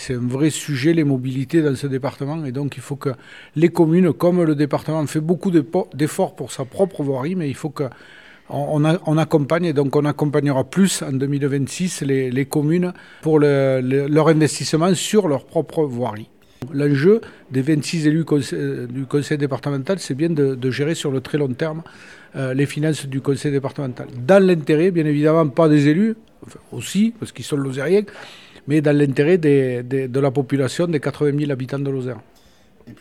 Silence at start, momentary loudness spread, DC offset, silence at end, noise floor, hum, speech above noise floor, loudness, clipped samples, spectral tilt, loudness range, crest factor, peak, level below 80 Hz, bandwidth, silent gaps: 0 s; 11 LU; 0.2%; 0.05 s; -52 dBFS; none; 34 dB; -19 LUFS; under 0.1%; -6.5 dB/octave; 5 LU; 18 dB; 0 dBFS; -60 dBFS; 14 kHz; none